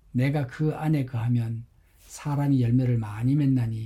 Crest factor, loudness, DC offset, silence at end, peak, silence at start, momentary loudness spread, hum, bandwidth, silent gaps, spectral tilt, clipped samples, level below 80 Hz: 12 dB; -25 LUFS; under 0.1%; 0 s; -12 dBFS; 0.15 s; 10 LU; none; 12.5 kHz; none; -8.5 dB/octave; under 0.1%; -52 dBFS